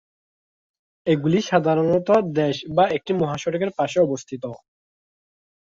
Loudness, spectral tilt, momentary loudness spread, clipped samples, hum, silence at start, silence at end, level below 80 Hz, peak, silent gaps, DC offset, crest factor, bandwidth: -21 LUFS; -6.5 dB/octave; 11 LU; under 0.1%; none; 1.05 s; 1.05 s; -60 dBFS; -4 dBFS; none; under 0.1%; 20 dB; 7.8 kHz